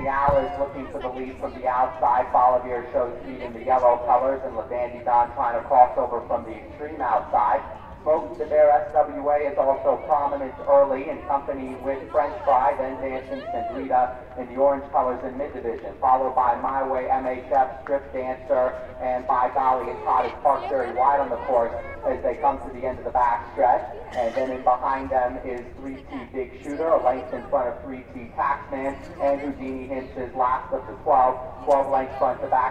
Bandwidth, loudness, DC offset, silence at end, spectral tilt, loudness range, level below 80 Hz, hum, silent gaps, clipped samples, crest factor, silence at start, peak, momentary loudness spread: 8.4 kHz; -24 LUFS; under 0.1%; 0 s; -7.5 dB/octave; 4 LU; -46 dBFS; none; none; under 0.1%; 20 dB; 0 s; -2 dBFS; 12 LU